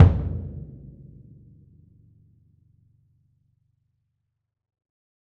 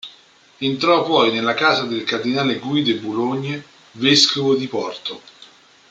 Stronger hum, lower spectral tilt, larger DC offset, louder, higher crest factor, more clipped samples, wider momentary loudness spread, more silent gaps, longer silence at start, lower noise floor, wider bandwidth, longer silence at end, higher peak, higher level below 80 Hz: neither; first, -10 dB/octave vs -4 dB/octave; neither; second, -25 LUFS vs -18 LUFS; first, 26 dB vs 20 dB; neither; first, 26 LU vs 15 LU; neither; about the same, 0 s vs 0.05 s; first, -80 dBFS vs -50 dBFS; second, 3.5 kHz vs 9.4 kHz; first, 4.65 s vs 0.45 s; about the same, -2 dBFS vs 0 dBFS; first, -38 dBFS vs -64 dBFS